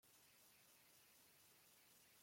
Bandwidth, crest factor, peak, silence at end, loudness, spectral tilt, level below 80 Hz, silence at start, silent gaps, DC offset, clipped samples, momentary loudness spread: 16.5 kHz; 14 dB; -58 dBFS; 0 s; -69 LUFS; -1 dB/octave; under -90 dBFS; 0 s; none; under 0.1%; under 0.1%; 0 LU